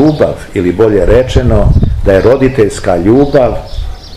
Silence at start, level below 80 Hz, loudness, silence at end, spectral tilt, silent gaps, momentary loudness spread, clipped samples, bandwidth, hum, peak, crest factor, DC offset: 0 s; -16 dBFS; -9 LUFS; 0 s; -7.5 dB/octave; none; 7 LU; 4%; 13 kHz; none; 0 dBFS; 8 dB; 1%